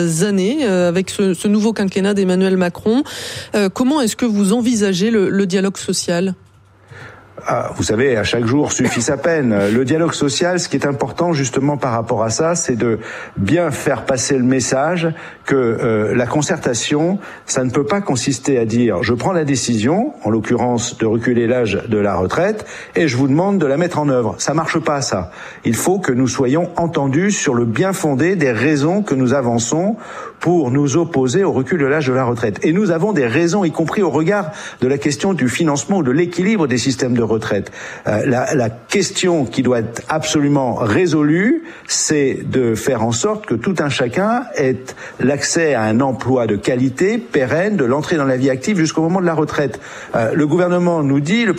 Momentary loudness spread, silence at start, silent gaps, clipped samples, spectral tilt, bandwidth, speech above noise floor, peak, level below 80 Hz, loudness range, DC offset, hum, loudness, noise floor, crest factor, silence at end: 5 LU; 0 s; none; under 0.1%; -5 dB/octave; 15 kHz; 28 dB; 0 dBFS; -50 dBFS; 2 LU; under 0.1%; none; -16 LUFS; -44 dBFS; 16 dB; 0 s